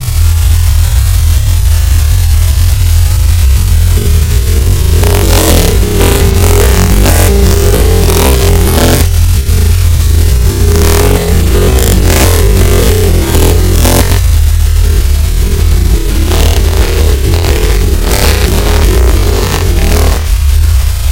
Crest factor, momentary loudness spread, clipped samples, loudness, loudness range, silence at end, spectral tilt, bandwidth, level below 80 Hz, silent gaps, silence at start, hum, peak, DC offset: 6 dB; 3 LU; 3%; -8 LUFS; 2 LU; 0 s; -5 dB/octave; 17.5 kHz; -8 dBFS; none; 0 s; none; 0 dBFS; 6%